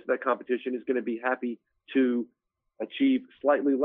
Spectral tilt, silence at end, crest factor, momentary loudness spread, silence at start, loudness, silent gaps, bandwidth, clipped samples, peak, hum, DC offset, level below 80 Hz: -3 dB/octave; 0 s; 18 dB; 12 LU; 0.05 s; -28 LUFS; none; 3.9 kHz; under 0.1%; -10 dBFS; none; under 0.1%; -80 dBFS